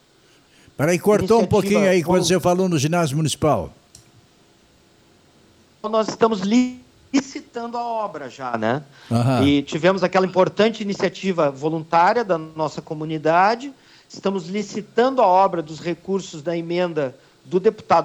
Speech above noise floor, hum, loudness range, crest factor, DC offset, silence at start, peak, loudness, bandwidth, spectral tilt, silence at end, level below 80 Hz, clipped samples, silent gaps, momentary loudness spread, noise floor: 35 dB; none; 6 LU; 16 dB; under 0.1%; 0.8 s; -4 dBFS; -20 LUFS; 16 kHz; -5.5 dB/octave; 0 s; -54 dBFS; under 0.1%; none; 11 LU; -55 dBFS